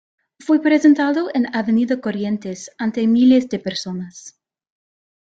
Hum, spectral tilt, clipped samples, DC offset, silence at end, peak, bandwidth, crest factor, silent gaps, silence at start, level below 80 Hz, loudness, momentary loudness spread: none; -5.5 dB/octave; under 0.1%; under 0.1%; 1.05 s; -2 dBFS; 8 kHz; 16 dB; none; 0.45 s; -62 dBFS; -18 LUFS; 15 LU